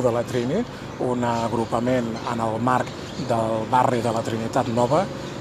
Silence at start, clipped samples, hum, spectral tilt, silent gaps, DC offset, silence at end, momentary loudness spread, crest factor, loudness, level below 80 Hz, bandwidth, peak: 0 s; under 0.1%; none; -6 dB/octave; none; under 0.1%; 0 s; 7 LU; 18 dB; -23 LUFS; -50 dBFS; 14 kHz; -6 dBFS